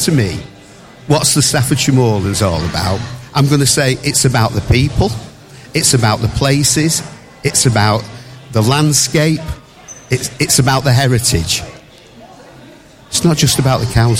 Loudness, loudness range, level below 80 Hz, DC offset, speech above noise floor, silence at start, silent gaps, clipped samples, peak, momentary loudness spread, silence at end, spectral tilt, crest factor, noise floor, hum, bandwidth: -13 LUFS; 2 LU; -32 dBFS; under 0.1%; 27 dB; 0 s; none; under 0.1%; 0 dBFS; 10 LU; 0 s; -4 dB/octave; 14 dB; -39 dBFS; none; 16.5 kHz